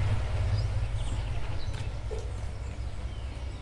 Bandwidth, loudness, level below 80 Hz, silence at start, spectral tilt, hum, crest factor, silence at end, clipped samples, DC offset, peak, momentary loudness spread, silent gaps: 11 kHz; -34 LUFS; -34 dBFS; 0 s; -6 dB/octave; none; 14 dB; 0 s; under 0.1%; under 0.1%; -16 dBFS; 8 LU; none